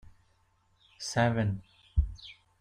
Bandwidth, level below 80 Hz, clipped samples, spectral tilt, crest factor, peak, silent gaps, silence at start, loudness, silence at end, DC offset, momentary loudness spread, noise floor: 10.5 kHz; -40 dBFS; under 0.1%; -5.5 dB/octave; 18 dB; -14 dBFS; none; 0.05 s; -32 LUFS; 0.25 s; under 0.1%; 17 LU; -69 dBFS